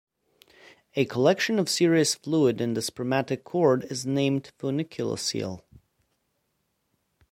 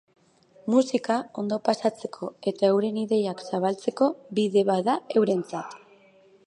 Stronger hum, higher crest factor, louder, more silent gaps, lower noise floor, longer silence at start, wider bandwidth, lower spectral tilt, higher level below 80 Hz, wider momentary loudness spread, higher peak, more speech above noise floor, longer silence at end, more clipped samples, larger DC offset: neither; about the same, 20 dB vs 20 dB; about the same, -26 LUFS vs -25 LUFS; neither; first, -76 dBFS vs -57 dBFS; first, 0.95 s vs 0.65 s; first, 16.5 kHz vs 11 kHz; second, -4.5 dB/octave vs -6 dB/octave; first, -66 dBFS vs -78 dBFS; about the same, 9 LU vs 11 LU; about the same, -6 dBFS vs -6 dBFS; first, 50 dB vs 32 dB; first, 1.75 s vs 0.7 s; neither; neither